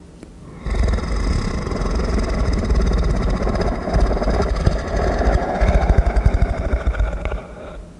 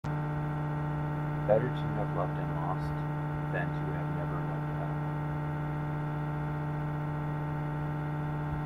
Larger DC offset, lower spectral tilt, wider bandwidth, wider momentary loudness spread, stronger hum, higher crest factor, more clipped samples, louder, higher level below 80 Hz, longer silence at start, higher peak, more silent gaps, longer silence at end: neither; second, -7 dB/octave vs -9.5 dB/octave; first, 10 kHz vs 4.7 kHz; first, 10 LU vs 2 LU; neither; about the same, 18 dB vs 22 dB; neither; first, -21 LUFS vs -33 LUFS; first, -20 dBFS vs -50 dBFS; about the same, 0 s vs 0.05 s; first, 0 dBFS vs -12 dBFS; neither; about the same, 0.05 s vs 0 s